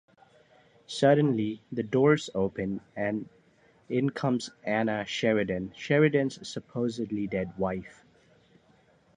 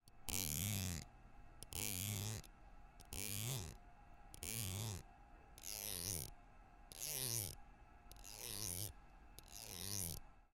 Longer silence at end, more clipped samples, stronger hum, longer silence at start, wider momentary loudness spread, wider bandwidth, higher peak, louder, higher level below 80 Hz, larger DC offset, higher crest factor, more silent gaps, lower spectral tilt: first, 1.25 s vs 0.1 s; neither; neither; first, 0.9 s vs 0.05 s; second, 11 LU vs 24 LU; second, 10 kHz vs 17 kHz; first, -10 dBFS vs -20 dBFS; first, -28 LUFS vs -45 LUFS; about the same, -62 dBFS vs -60 dBFS; neither; second, 20 dB vs 28 dB; neither; first, -6.5 dB/octave vs -2.5 dB/octave